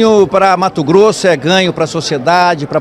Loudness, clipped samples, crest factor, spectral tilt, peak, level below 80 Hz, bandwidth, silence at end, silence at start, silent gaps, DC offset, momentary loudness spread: -10 LUFS; 0.3%; 10 dB; -5 dB/octave; 0 dBFS; -48 dBFS; 13 kHz; 0 s; 0 s; none; under 0.1%; 6 LU